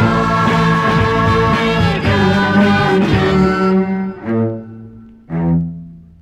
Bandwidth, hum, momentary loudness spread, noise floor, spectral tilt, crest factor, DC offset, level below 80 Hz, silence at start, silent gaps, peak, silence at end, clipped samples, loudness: 10.5 kHz; none; 9 LU; -36 dBFS; -7 dB/octave; 12 dB; under 0.1%; -32 dBFS; 0 s; none; -2 dBFS; 0.2 s; under 0.1%; -14 LUFS